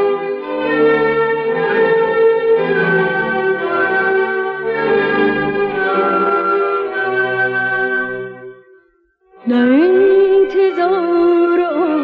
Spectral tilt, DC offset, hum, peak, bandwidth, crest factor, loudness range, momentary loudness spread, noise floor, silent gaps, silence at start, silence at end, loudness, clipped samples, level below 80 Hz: -8.5 dB/octave; under 0.1%; none; -4 dBFS; 5.2 kHz; 12 dB; 3 LU; 7 LU; -56 dBFS; none; 0 s; 0 s; -14 LUFS; under 0.1%; -54 dBFS